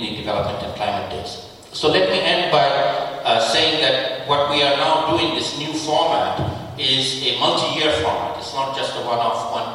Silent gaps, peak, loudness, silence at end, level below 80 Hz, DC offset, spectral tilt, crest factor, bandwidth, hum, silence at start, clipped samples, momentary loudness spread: none; -2 dBFS; -19 LUFS; 0 s; -50 dBFS; under 0.1%; -3.5 dB/octave; 16 dB; 16 kHz; none; 0 s; under 0.1%; 9 LU